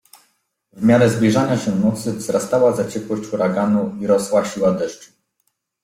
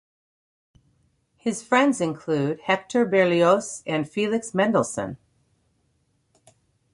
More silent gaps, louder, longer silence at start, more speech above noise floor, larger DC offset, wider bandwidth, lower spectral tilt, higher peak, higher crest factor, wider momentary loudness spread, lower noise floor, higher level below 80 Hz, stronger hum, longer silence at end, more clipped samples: neither; first, -18 LUFS vs -23 LUFS; second, 0.75 s vs 1.45 s; first, 53 dB vs 46 dB; neither; first, 15.5 kHz vs 11.5 kHz; first, -6.5 dB/octave vs -5 dB/octave; first, -2 dBFS vs -6 dBFS; about the same, 16 dB vs 20 dB; about the same, 10 LU vs 10 LU; about the same, -70 dBFS vs -69 dBFS; first, -54 dBFS vs -64 dBFS; neither; second, 0.8 s vs 1.8 s; neither